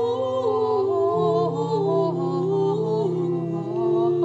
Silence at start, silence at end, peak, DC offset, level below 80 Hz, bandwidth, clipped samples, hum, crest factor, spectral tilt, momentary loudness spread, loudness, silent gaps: 0 s; 0 s; -10 dBFS; under 0.1%; -68 dBFS; 7.8 kHz; under 0.1%; none; 12 dB; -9 dB/octave; 4 LU; -23 LUFS; none